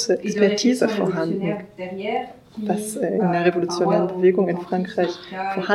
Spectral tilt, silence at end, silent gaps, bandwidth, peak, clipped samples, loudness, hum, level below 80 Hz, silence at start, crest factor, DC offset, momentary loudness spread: -5.5 dB/octave; 0 s; none; 13.5 kHz; -4 dBFS; under 0.1%; -22 LUFS; none; -64 dBFS; 0 s; 18 dB; under 0.1%; 11 LU